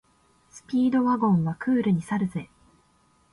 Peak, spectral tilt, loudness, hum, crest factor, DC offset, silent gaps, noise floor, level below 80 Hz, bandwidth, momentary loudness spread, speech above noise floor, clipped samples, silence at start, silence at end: -12 dBFS; -8 dB/octave; -24 LUFS; none; 14 dB; under 0.1%; none; -63 dBFS; -62 dBFS; 11.5 kHz; 8 LU; 40 dB; under 0.1%; 0.55 s; 0.85 s